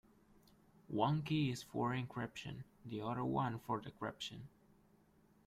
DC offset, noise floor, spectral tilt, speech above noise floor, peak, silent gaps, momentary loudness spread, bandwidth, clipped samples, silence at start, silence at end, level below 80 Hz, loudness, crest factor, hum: under 0.1%; -70 dBFS; -6.5 dB/octave; 30 dB; -20 dBFS; none; 13 LU; 15 kHz; under 0.1%; 0.9 s; 1 s; -70 dBFS; -41 LUFS; 22 dB; none